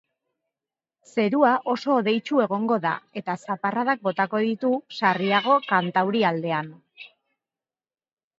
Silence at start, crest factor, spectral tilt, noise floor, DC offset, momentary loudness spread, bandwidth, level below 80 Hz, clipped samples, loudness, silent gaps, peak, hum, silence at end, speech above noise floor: 1.15 s; 20 dB; -6.5 dB/octave; under -90 dBFS; under 0.1%; 9 LU; 7.8 kHz; -76 dBFS; under 0.1%; -23 LUFS; none; -6 dBFS; none; 1.3 s; over 67 dB